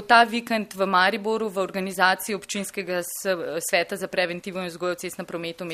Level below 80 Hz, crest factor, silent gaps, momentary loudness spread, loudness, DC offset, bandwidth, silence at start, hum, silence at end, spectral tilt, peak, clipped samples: -66 dBFS; 22 dB; none; 11 LU; -25 LUFS; under 0.1%; 15.5 kHz; 0 s; none; 0 s; -3 dB/octave; -2 dBFS; under 0.1%